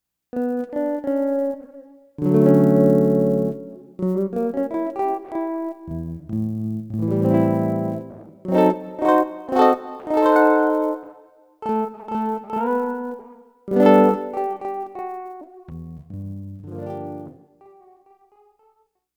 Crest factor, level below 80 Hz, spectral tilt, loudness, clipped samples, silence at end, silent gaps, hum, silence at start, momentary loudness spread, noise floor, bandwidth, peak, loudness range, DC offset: 20 dB; -58 dBFS; -9 dB/octave; -21 LUFS; under 0.1%; 1.85 s; none; none; 0.35 s; 20 LU; -63 dBFS; over 20 kHz; -2 dBFS; 14 LU; under 0.1%